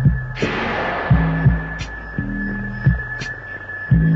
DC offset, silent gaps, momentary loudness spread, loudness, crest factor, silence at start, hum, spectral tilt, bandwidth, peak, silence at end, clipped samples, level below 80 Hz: under 0.1%; none; 11 LU; -21 LUFS; 16 dB; 0 s; none; -7.5 dB/octave; 7.2 kHz; -4 dBFS; 0 s; under 0.1%; -28 dBFS